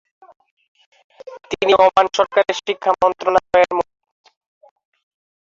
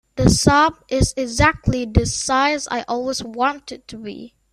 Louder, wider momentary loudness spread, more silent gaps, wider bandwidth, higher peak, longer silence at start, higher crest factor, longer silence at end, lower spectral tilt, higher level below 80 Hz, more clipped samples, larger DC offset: about the same, -16 LUFS vs -18 LUFS; about the same, 16 LU vs 18 LU; neither; second, 7.6 kHz vs 14 kHz; about the same, 0 dBFS vs 0 dBFS; first, 1.25 s vs 0.15 s; about the same, 18 dB vs 18 dB; first, 1.6 s vs 0.25 s; about the same, -3.5 dB/octave vs -4.5 dB/octave; second, -56 dBFS vs -32 dBFS; neither; neither